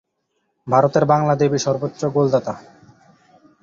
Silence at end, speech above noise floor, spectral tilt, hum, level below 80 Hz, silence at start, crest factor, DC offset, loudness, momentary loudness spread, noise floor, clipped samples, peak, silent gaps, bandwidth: 1 s; 54 dB; -6.5 dB/octave; none; -56 dBFS; 0.65 s; 18 dB; under 0.1%; -18 LUFS; 13 LU; -71 dBFS; under 0.1%; -2 dBFS; none; 7.4 kHz